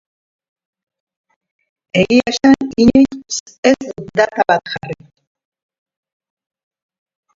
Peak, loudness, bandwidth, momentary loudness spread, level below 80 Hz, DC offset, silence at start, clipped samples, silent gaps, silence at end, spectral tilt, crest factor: 0 dBFS; -14 LUFS; 7.6 kHz; 14 LU; -48 dBFS; under 0.1%; 1.95 s; under 0.1%; 3.40-3.46 s, 3.58-3.63 s; 2.45 s; -4.5 dB/octave; 18 dB